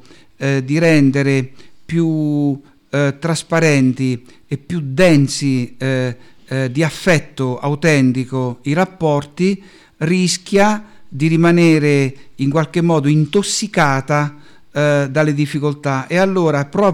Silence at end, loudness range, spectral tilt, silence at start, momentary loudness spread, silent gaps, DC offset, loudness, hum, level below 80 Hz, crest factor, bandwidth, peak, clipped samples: 0 s; 3 LU; -6 dB/octave; 0.4 s; 11 LU; none; under 0.1%; -16 LUFS; none; -50 dBFS; 12 dB; 13 kHz; -4 dBFS; under 0.1%